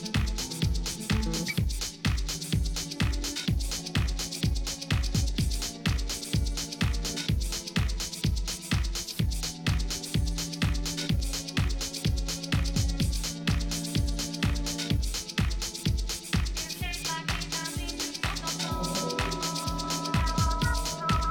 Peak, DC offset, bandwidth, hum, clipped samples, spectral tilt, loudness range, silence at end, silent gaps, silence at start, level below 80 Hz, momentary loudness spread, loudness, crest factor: -16 dBFS; under 0.1%; 19 kHz; none; under 0.1%; -4 dB/octave; 1 LU; 0 s; none; 0 s; -34 dBFS; 3 LU; -30 LUFS; 12 dB